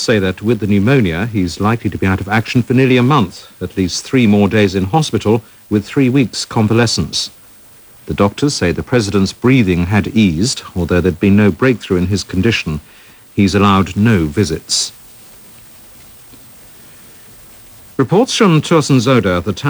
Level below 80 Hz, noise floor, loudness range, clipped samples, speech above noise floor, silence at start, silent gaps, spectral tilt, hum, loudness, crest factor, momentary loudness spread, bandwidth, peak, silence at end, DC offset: -38 dBFS; -41 dBFS; 5 LU; under 0.1%; 28 dB; 0 s; none; -5.5 dB/octave; none; -14 LUFS; 14 dB; 7 LU; over 20 kHz; 0 dBFS; 0 s; under 0.1%